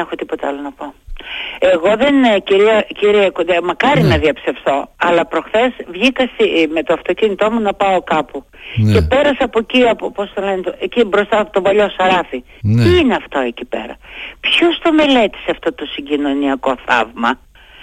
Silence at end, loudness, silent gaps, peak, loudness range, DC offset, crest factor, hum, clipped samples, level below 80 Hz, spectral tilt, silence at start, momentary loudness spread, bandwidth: 0 s; -14 LUFS; none; -2 dBFS; 2 LU; under 0.1%; 14 dB; none; under 0.1%; -36 dBFS; -6.5 dB/octave; 0 s; 13 LU; 13.5 kHz